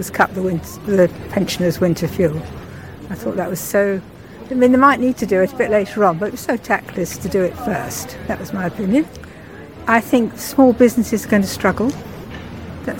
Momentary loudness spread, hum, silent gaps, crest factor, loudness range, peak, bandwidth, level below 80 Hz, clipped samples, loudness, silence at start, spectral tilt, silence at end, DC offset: 18 LU; none; none; 18 dB; 4 LU; 0 dBFS; 17 kHz; -44 dBFS; under 0.1%; -18 LUFS; 0 s; -5.5 dB/octave; 0 s; 0.2%